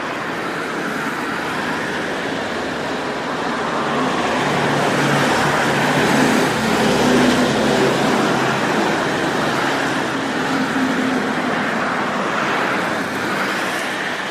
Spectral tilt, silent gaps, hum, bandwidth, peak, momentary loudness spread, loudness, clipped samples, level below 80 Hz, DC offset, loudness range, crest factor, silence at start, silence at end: -4.5 dB/octave; none; none; 15.5 kHz; -4 dBFS; 7 LU; -18 LUFS; under 0.1%; -48 dBFS; under 0.1%; 6 LU; 14 dB; 0 s; 0 s